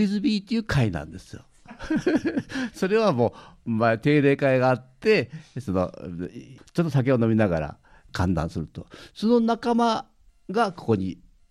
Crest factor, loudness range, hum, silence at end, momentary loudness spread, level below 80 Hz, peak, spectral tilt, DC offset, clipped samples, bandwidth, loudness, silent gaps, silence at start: 16 dB; 3 LU; none; 0.35 s; 16 LU; -48 dBFS; -8 dBFS; -7 dB/octave; under 0.1%; under 0.1%; 12.5 kHz; -24 LUFS; none; 0 s